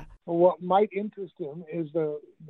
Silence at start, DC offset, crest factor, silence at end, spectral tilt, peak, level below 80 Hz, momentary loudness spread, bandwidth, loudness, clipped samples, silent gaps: 0 s; under 0.1%; 18 dB; 0 s; -10.5 dB/octave; -8 dBFS; -60 dBFS; 14 LU; 4.1 kHz; -27 LUFS; under 0.1%; none